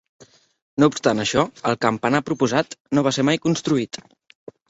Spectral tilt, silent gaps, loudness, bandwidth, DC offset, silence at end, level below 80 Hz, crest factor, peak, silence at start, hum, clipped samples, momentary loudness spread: -5 dB/octave; 2.80-2.85 s; -21 LUFS; 8 kHz; under 0.1%; 0.75 s; -56 dBFS; 20 dB; -2 dBFS; 0.75 s; none; under 0.1%; 5 LU